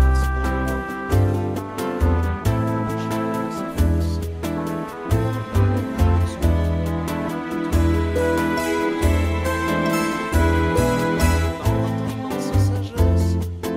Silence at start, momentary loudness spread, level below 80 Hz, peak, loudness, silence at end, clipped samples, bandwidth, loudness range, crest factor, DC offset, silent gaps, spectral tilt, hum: 0 s; 7 LU; -26 dBFS; -6 dBFS; -21 LUFS; 0 s; under 0.1%; 16 kHz; 3 LU; 14 dB; under 0.1%; none; -6.5 dB/octave; none